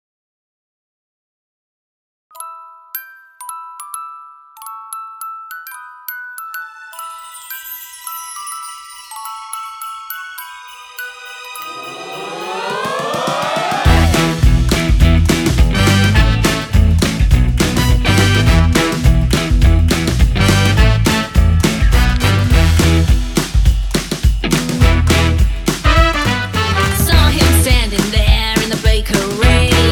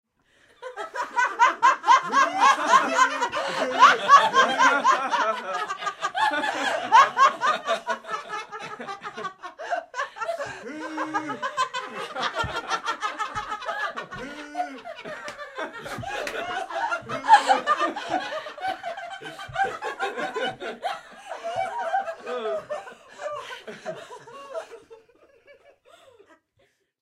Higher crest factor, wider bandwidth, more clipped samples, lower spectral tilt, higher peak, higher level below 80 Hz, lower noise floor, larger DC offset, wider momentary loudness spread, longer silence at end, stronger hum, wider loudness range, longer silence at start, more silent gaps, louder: second, 14 dB vs 22 dB; first, 19 kHz vs 14 kHz; neither; first, -5 dB/octave vs -2 dB/octave; about the same, 0 dBFS vs -2 dBFS; first, -18 dBFS vs -62 dBFS; second, -37 dBFS vs -67 dBFS; neither; about the same, 18 LU vs 19 LU; second, 0 s vs 2.05 s; neither; first, 17 LU vs 14 LU; first, 2.35 s vs 0.6 s; neither; first, -13 LUFS vs -23 LUFS